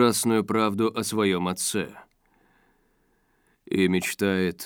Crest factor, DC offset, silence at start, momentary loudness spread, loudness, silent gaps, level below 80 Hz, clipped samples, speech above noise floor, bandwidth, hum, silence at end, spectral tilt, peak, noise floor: 18 dB; under 0.1%; 0 s; 5 LU; -25 LUFS; none; -66 dBFS; under 0.1%; 43 dB; over 20 kHz; none; 0 s; -4.5 dB/octave; -8 dBFS; -67 dBFS